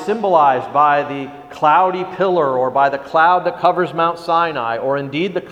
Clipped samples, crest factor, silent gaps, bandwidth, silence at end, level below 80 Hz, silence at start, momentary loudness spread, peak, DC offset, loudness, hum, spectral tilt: under 0.1%; 16 dB; none; 10 kHz; 0 s; -60 dBFS; 0 s; 7 LU; 0 dBFS; under 0.1%; -16 LUFS; none; -6.5 dB/octave